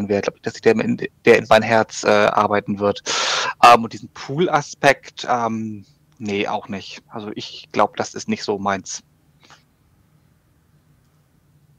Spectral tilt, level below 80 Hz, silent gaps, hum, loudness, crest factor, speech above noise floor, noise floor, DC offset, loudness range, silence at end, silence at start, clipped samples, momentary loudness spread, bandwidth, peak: -4 dB/octave; -58 dBFS; none; none; -18 LUFS; 18 dB; 39 dB; -58 dBFS; under 0.1%; 11 LU; 2.8 s; 0 s; under 0.1%; 18 LU; 16 kHz; -2 dBFS